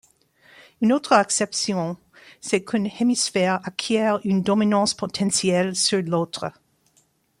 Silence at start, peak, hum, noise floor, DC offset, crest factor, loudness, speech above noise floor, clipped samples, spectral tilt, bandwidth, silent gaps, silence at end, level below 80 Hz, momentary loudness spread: 0.8 s; -2 dBFS; none; -64 dBFS; under 0.1%; 20 dB; -22 LUFS; 42 dB; under 0.1%; -4 dB/octave; 15.5 kHz; none; 0.9 s; -64 dBFS; 9 LU